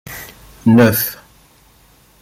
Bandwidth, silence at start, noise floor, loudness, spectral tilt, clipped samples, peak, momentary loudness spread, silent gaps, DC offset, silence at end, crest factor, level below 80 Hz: 16 kHz; 0.1 s; -50 dBFS; -13 LUFS; -6 dB/octave; under 0.1%; -2 dBFS; 21 LU; none; under 0.1%; 1.1 s; 16 dB; -48 dBFS